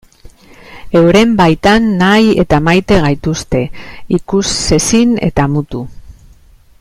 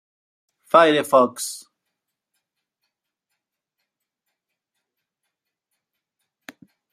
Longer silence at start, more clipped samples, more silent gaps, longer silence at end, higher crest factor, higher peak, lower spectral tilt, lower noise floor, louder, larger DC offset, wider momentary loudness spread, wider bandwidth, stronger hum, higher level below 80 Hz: second, 0.25 s vs 0.75 s; neither; neither; second, 0.7 s vs 5.35 s; second, 12 dB vs 24 dB; about the same, 0 dBFS vs -2 dBFS; first, -5 dB/octave vs -3.5 dB/octave; second, -42 dBFS vs -81 dBFS; first, -11 LUFS vs -17 LUFS; neither; second, 9 LU vs 15 LU; second, 14.5 kHz vs 16 kHz; neither; first, -30 dBFS vs -78 dBFS